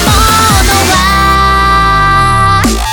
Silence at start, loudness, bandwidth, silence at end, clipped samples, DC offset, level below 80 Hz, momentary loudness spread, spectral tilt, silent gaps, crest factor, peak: 0 s; -7 LUFS; over 20 kHz; 0 s; 0.2%; under 0.1%; -16 dBFS; 1 LU; -3.5 dB/octave; none; 8 dB; 0 dBFS